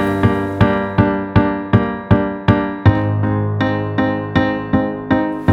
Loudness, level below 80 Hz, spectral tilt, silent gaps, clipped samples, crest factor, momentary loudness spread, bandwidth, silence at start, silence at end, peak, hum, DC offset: -16 LUFS; -34 dBFS; -9 dB/octave; none; under 0.1%; 16 dB; 3 LU; 5.8 kHz; 0 s; 0 s; 0 dBFS; none; under 0.1%